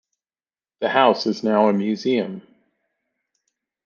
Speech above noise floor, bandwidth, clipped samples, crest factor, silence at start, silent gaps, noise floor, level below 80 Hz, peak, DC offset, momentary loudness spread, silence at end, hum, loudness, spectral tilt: over 71 dB; 7.2 kHz; under 0.1%; 22 dB; 0.8 s; none; under -90 dBFS; -72 dBFS; -2 dBFS; under 0.1%; 11 LU; 1.45 s; none; -20 LUFS; -6 dB/octave